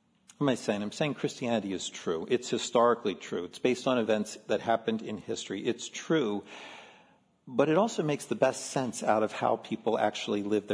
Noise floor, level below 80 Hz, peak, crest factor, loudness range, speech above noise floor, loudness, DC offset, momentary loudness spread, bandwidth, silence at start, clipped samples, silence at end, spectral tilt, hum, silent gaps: -63 dBFS; -76 dBFS; -10 dBFS; 20 dB; 3 LU; 33 dB; -30 LUFS; under 0.1%; 9 LU; 11 kHz; 0.4 s; under 0.1%; 0 s; -4.5 dB/octave; none; none